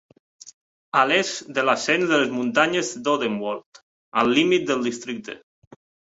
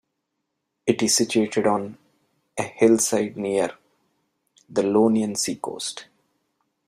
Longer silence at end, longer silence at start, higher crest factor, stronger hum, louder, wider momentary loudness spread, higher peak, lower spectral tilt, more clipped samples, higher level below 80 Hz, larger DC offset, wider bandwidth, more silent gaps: second, 0.65 s vs 0.85 s; second, 0.45 s vs 0.85 s; about the same, 20 dB vs 20 dB; neither; about the same, -21 LUFS vs -22 LUFS; about the same, 13 LU vs 12 LU; about the same, -2 dBFS vs -4 dBFS; about the same, -3.5 dB/octave vs -3.5 dB/octave; neither; about the same, -66 dBFS vs -64 dBFS; neither; second, 8 kHz vs 15.5 kHz; first, 0.53-0.92 s, 3.66-3.72 s, 3.82-4.12 s vs none